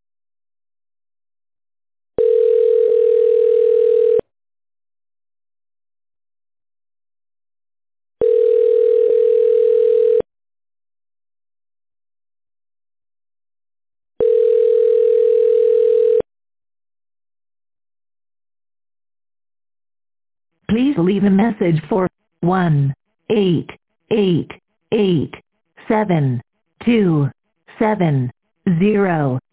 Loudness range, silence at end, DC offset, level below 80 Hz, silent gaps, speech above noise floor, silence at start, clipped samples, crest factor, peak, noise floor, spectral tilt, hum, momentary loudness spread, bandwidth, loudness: 7 LU; 0.15 s; 0.1%; -54 dBFS; none; over 74 dB; 2.2 s; under 0.1%; 14 dB; -6 dBFS; under -90 dBFS; -12 dB/octave; none; 8 LU; 4 kHz; -16 LUFS